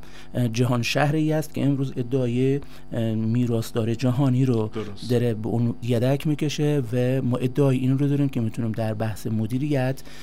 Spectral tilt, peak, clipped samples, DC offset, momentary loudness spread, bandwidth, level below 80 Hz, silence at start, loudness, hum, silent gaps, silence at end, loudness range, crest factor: -7 dB/octave; -6 dBFS; under 0.1%; 2%; 6 LU; 15.5 kHz; -52 dBFS; 0 s; -24 LUFS; none; none; 0 s; 1 LU; 16 dB